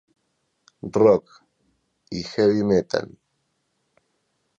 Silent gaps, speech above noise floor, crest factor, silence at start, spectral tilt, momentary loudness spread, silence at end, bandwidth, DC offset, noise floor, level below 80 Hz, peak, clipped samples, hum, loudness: none; 52 dB; 20 dB; 0.85 s; -6.5 dB/octave; 17 LU; 1.55 s; 7.8 kHz; under 0.1%; -73 dBFS; -56 dBFS; -4 dBFS; under 0.1%; none; -21 LUFS